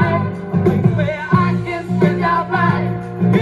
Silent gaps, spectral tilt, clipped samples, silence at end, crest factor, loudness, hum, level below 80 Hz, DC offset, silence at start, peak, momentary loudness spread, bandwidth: none; -9 dB/octave; under 0.1%; 0 s; 16 dB; -17 LUFS; none; -42 dBFS; under 0.1%; 0 s; 0 dBFS; 5 LU; 7.2 kHz